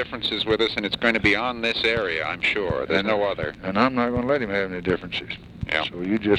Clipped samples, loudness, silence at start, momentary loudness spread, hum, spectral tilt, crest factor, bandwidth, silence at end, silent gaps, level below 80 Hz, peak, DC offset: under 0.1%; -23 LUFS; 0 s; 6 LU; none; -5.5 dB/octave; 20 dB; 12 kHz; 0 s; none; -46 dBFS; -4 dBFS; under 0.1%